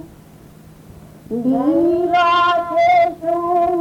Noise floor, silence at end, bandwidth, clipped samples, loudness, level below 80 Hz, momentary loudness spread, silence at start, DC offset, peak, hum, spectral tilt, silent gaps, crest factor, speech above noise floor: -42 dBFS; 0 s; 11.5 kHz; under 0.1%; -16 LUFS; -50 dBFS; 7 LU; 0 s; under 0.1%; -4 dBFS; none; -6 dB/octave; none; 12 dB; 27 dB